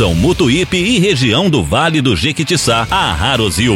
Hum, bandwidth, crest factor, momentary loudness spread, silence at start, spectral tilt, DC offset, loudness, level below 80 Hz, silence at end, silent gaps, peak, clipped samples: none; 16.5 kHz; 12 dB; 2 LU; 0 s; -4.5 dB/octave; under 0.1%; -12 LUFS; -28 dBFS; 0 s; none; 0 dBFS; under 0.1%